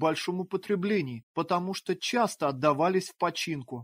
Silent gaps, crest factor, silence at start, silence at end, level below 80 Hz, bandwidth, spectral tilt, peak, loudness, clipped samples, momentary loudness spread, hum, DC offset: 1.23-1.35 s; 18 dB; 0 s; 0 s; -72 dBFS; 16 kHz; -5 dB/octave; -10 dBFS; -29 LUFS; under 0.1%; 7 LU; none; under 0.1%